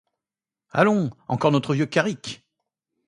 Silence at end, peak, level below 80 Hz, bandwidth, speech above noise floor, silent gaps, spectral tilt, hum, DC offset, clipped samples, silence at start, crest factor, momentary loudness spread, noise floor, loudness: 0.7 s; -2 dBFS; -64 dBFS; 11 kHz; over 68 dB; none; -6.5 dB/octave; none; under 0.1%; under 0.1%; 0.75 s; 22 dB; 14 LU; under -90 dBFS; -22 LUFS